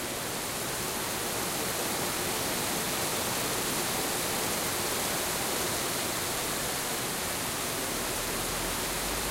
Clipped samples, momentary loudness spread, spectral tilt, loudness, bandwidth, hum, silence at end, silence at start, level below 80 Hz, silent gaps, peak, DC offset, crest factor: under 0.1%; 2 LU; -2 dB/octave; -29 LUFS; 16 kHz; none; 0 s; 0 s; -50 dBFS; none; -18 dBFS; under 0.1%; 14 dB